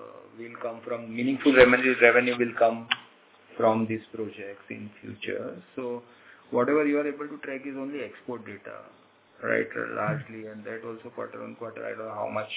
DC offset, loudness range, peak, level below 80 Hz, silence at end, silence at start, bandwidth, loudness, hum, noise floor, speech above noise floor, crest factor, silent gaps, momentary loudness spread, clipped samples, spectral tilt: under 0.1%; 11 LU; -2 dBFS; -62 dBFS; 0 s; 0 s; 4 kHz; -26 LUFS; none; -55 dBFS; 28 dB; 26 dB; none; 21 LU; under 0.1%; -9 dB/octave